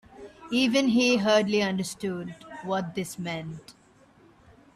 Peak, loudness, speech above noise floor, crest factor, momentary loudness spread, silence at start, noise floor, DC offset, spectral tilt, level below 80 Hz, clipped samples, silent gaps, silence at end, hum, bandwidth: -10 dBFS; -26 LUFS; 32 dB; 18 dB; 18 LU; 0.15 s; -57 dBFS; under 0.1%; -4.5 dB/octave; -64 dBFS; under 0.1%; none; 1.05 s; none; 14 kHz